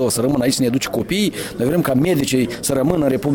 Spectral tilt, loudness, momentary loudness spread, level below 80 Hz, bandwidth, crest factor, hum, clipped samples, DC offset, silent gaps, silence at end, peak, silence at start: -5 dB/octave; -18 LUFS; 4 LU; -44 dBFS; 18 kHz; 16 dB; none; under 0.1%; under 0.1%; none; 0 s; -2 dBFS; 0 s